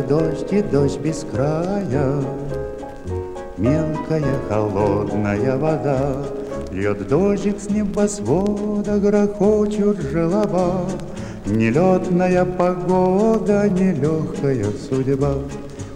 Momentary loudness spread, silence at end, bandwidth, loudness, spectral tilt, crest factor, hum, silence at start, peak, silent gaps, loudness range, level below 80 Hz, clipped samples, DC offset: 10 LU; 0 s; 11 kHz; -20 LUFS; -7.5 dB/octave; 16 dB; none; 0 s; -4 dBFS; none; 4 LU; -38 dBFS; under 0.1%; under 0.1%